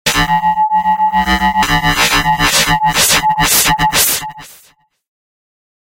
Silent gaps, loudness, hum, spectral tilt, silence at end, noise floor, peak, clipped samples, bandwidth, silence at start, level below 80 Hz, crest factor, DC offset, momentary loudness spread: none; -11 LUFS; none; -1.5 dB/octave; 1.45 s; -50 dBFS; 0 dBFS; under 0.1%; 17.5 kHz; 0.05 s; -30 dBFS; 14 dB; under 0.1%; 3 LU